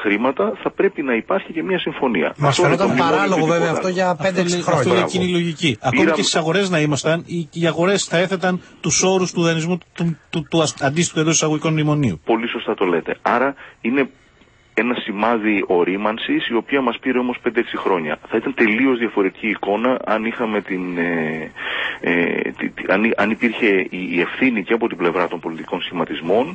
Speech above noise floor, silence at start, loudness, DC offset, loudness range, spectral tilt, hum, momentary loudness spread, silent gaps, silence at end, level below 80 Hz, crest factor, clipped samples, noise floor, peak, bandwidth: 33 dB; 0 s; -19 LUFS; under 0.1%; 3 LU; -4.5 dB/octave; none; 6 LU; none; 0 s; -56 dBFS; 16 dB; under 0.1%; -52 dBFS; -2 dBFS; 8.8 kHz